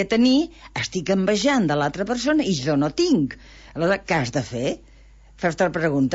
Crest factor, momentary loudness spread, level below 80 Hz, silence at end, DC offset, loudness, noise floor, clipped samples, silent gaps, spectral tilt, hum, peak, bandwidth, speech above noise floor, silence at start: 14 dB; 9 LU; -48 dBFS; 0 s; under 0.1%; -22 LUFS; -48 dBFS; under 0.1%; none; -5 dB/octave; none; -8 dBFS; 8 kHz; 27 dB; 0 s